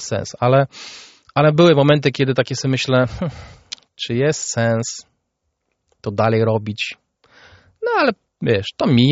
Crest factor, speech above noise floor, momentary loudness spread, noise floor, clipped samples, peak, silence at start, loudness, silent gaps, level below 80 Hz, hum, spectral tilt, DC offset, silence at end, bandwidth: 18 dB; 56 dB; 17 LU; -73 dBFS; under 0.1%; -2 dBFS; 0 s; -18 LUFS; none; -50 dBFS; none; -5 dB/octave; under 0.1%; 0 s; 8 kHz